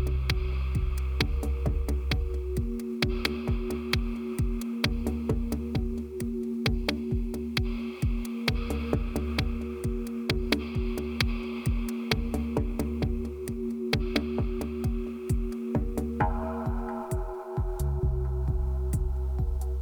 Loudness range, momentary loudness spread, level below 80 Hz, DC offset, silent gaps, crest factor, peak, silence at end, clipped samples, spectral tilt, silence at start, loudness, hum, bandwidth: 1 LU; 4 LU; -32 dBFS; under 0.1%; none; 20 dB; -8 dBFS; 0 s; under 0.1%; -6 dB/octave; 0 s; -31 LUFS; none; 19.5 kHz